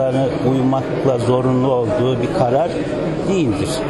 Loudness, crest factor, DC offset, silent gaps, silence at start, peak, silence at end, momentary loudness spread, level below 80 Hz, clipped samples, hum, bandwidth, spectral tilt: -17 LUFS; 14 dB; under 0.1%; none; 0 s; -4 dBFS; 0 s; 4 LU; -42 dBFS; under 0.1%; none; 12 kHz; -7 dB/octave